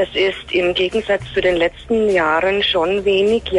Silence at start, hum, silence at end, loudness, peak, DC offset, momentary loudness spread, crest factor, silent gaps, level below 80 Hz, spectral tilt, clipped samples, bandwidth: 0 s; none; 0 s; -17 LUFS; -6 dBFS; under 0.1%; 4 LU; 10 dB; none; -40 dBFS; -5 dB/octave; under 0.1%; 11 kHz